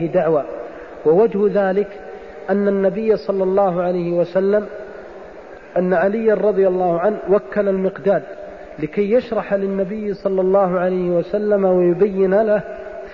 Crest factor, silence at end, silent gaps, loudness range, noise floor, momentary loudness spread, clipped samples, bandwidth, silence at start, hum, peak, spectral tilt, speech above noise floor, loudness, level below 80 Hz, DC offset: 14 dB; 0 s; none; 2 LU; -37 dBFS; 17 LU; under 0.1%; 6 kHz; 0 s; none; -4 dBFS; -9.5 dB/octave; 21 dB; -18 LUFS; -50 dBFS; 0.3%